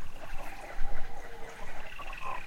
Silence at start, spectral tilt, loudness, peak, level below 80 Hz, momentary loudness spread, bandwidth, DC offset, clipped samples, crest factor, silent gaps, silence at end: 0 s; -4 dB/octave; -44 LUFS; -14 dBFS; -38 dBFS; 5 LU; 7.2 kHz; under 0.1%; under 0.1%; 14 dB; none; 0 s